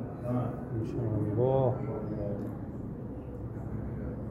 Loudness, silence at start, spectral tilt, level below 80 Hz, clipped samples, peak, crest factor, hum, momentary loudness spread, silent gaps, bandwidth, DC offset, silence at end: -34 LUFS; 0 s; -11 dB/octave; -48 dBFS; under 0.1%; -14 dBFS; 18 dB; none; 12 LU; none; 5.2 kHz; under 0.1%; 0 s